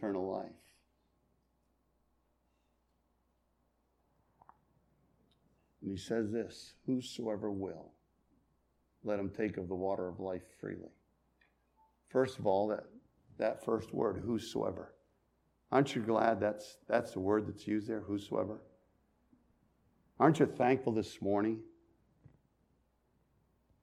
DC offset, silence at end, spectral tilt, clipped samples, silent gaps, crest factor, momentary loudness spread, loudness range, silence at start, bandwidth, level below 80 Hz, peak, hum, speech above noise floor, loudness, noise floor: under 0.1%; 2.15 s; -6.5 dB/octave; under 0.1%; none; 26 dB; 15 LU; 7 LU; 0 s; 14 kHz; -72 dBFS; -12 dBFS; none; 42 dB; -36 LUFS; -77 dBFS